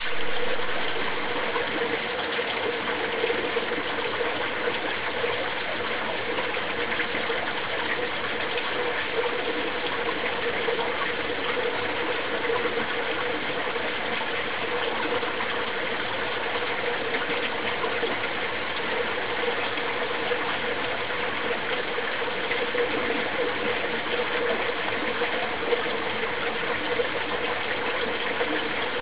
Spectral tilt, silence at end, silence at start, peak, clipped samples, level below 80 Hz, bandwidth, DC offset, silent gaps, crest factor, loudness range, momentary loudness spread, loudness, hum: -0.5 dB/octave; 0 s; 0 s; -10 dBFS; under 0.1%; -56 dBFS; 4 kHz; 1%; none; 16 dB; 1 LU; 2 LU; -26 LUFS; none